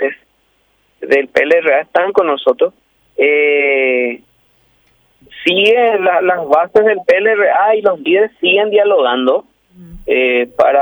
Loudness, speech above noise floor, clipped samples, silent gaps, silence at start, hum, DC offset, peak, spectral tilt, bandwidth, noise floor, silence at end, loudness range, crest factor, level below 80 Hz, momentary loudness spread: -12 LUFS; 47 dB; under 0.1%; none; 0 s; none; under 0.1%; 0 dBFS; -5 dB/octave; over 20 kHz; -58 dBFS; 0 s; 3 LU; 12 dB; -52 dBFS; 7 LU